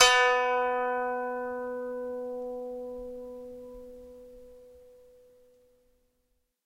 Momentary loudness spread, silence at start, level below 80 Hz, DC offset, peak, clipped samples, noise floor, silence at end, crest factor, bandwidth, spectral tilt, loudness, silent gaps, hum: 24 LU; 0 s; -62 dBFS; under 0.1%; -2 dBFS; under 0.1%; -75 dBFS; 1.85 s; 28 dB; 15.5 kHz; 0.5 dB/octave; -29 LUFS; none; none